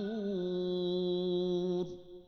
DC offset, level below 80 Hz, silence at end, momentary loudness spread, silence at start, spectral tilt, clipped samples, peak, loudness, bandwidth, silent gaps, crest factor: under 0.1%; -64 dBFS; 0.05 s; 4 LU; 0 s; -8 dB/octave; under 0.1%; -24 dBFS; -34 LUFS; 6.2 kHz; none; 10 dB